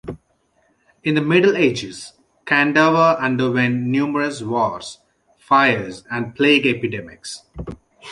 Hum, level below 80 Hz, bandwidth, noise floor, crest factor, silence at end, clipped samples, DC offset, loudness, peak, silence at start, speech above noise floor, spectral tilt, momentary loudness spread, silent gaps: none; -50 dBFS; 11.5 kHz; -63 dBFS; 18 dB; 0 s; under 0.1%; under 0.1%; -18 LUFS; -2 dBFS; 0.05 s; 45 dB; -5.5 dB/octave; 20 LU; none